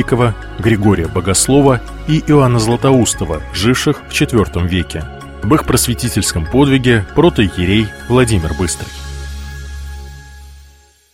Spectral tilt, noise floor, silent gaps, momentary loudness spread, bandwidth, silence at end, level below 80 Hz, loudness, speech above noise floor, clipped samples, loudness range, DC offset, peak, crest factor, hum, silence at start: -5 dB/octave; -45 dBFS; none; 16 LU; 16.5 kHz; 0.55 s; -28 dBFS; -13 LUFS; 32 dB; under 0.1%; 4 LU; under 0.1%; 0 dBFS; 14 dB; none; 0 s